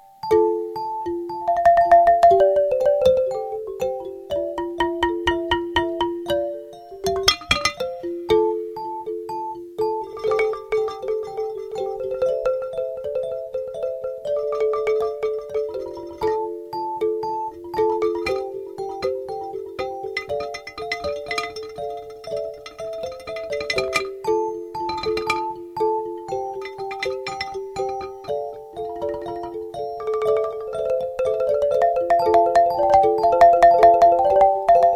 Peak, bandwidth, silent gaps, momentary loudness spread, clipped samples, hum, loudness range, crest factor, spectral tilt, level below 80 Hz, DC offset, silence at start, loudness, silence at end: 0 dBFS; 16 kHz; none; 15 LU; under 0.1%; none; 11 LU; 22 dB; -4 dB/octave; -48 dBFS; under 0.1%; 0.25 s; -22 LUFS; 0 s